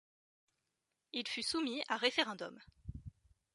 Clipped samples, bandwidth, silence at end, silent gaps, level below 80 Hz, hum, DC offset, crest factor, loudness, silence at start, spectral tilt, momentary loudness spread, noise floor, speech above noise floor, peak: under 0.1%; 11.5 kHz; 0.45 s; none; -64 dBFS; none; under 0.1%; 24 dB; -37 LUFS; 1.15 s; -3 dB/octave; 20 LU; -87 dBFS; 49 dB; -16 dBFS